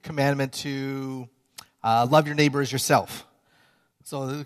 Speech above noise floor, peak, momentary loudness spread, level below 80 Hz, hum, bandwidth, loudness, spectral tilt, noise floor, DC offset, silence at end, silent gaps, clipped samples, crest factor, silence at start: 39 dB; -6 dBFS; 17 LU; -66 dBFS; none; 14 kHz; -24 LUFS; -5 dB/octave; -63 dBFS; under 0.1%; 0 s; none; under 0.1%; 20 dB; 0.05 s